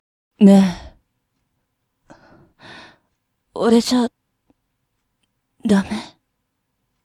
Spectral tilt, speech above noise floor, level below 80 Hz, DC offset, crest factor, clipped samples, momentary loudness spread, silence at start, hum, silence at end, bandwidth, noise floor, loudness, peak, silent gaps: -6.5 dB/octave; 60 dB; -54 dBFS; under 0.1%; 20 dB; under 0.1%; 18 LU; 0.4 s; none; 1 s; 13.5 kHz; -73 dBFS; -16 LUFS; 0 dBFS; none